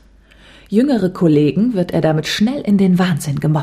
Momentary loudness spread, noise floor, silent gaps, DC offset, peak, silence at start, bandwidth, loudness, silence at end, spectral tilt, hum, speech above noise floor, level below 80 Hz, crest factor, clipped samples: 4 LU; -46 dBFS; none; under 0.1%; -2 dBFS; 0.7 s; 15 kHz; -15 LUFS; 0 s; -7 dB/octave; none; 31 dB; -46 dBFS; 12 dB; under 0.1%